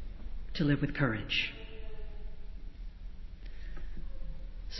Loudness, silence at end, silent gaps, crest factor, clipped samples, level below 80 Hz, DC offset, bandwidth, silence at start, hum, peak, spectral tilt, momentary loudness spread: -32 LUFS; 0 s; none; 20 dB; under 0.1%; -44 dBFS; under 0.1%; 6 kHz; 0 s; none; -16 dBFS; -6.5 dB/octave; 20 LU